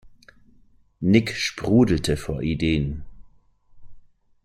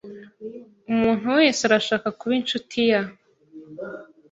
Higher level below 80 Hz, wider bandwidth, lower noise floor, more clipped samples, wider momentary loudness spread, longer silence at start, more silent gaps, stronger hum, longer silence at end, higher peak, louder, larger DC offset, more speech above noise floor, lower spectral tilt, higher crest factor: first, -42 dBFS vs -62 dBFS; first, 14 kHz vs 8 kHz; first, -55 dBFS vs -46 dBFS; neither; second, 9 LU vs 22 LU; about the same, 0.05 s vs 0.05 s; neither; neither; first, 0.45 s vs 0.25 s; about the same, -4 dBFS vs -4 dBFS; about the same, -22 LUFS vs -21 LUFS; neither; first, 34 dB vs 25 dB; first, -6 dB/octave vs -4 dB/octave; about the same, 20 dB vs 20 dB